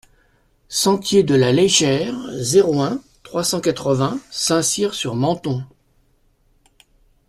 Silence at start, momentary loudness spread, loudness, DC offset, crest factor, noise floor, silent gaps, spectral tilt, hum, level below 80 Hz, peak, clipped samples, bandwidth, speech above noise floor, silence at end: 0.7 s; 11 LU; -18 LUFS; under 0.1%; 18 dB; -59 dBFS; none; -4 dB/octave; none; -54 dBFS; -2 dBFS; under 0.1%; 14 kHz; 42 dB; 1.6 s